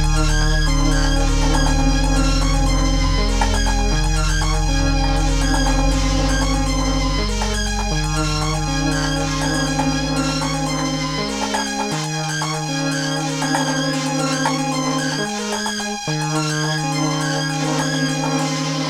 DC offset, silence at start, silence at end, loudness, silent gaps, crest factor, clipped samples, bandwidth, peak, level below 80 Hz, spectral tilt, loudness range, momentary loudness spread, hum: under 0.1%; 0 s; 0 s; -20 LUFS; none; 14 dB; under 0.1%; 14 kHz; -4 dBFS; -22 dBFS; -4 dB/octave; 2 LU; 3 LU; none